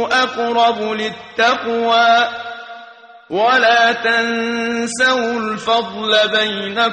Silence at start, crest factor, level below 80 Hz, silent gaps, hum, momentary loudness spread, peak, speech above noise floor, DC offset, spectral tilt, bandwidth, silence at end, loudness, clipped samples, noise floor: 0 s; 14 dB; -62 dBFS; none; none; 10 LU; -2 dBFS; 24 dB; under 0.1%; -2.5 dB/octave; 9.6 kHz; 0 s; -15 LUFS; under 0.1%; -40 dBFS